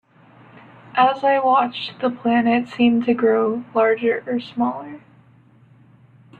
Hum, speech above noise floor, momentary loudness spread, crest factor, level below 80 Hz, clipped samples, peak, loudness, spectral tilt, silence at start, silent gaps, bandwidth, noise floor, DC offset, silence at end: none; 33 dB; 8 LU; 16 dB; -64 dBFS; under 0.1%; -4 dBFS; -19 LUFS; -7 dB/octave; 0.95 s; none; 4.8 kHz; -52 dBFS; under 0.1%; 1.4 s